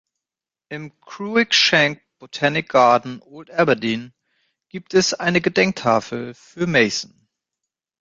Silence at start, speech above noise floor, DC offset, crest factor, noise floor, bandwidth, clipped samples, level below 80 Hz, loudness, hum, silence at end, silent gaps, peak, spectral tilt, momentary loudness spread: 0.7 s; 70 dB; under 0.1%; 20 dB; -89 dBFS; 9.4 kHz; under 0.1%; -60 dBFS; -18 LUFS; none; 0.95 s; none; -2 dBFS; -3.5 dB/octave; 20 LU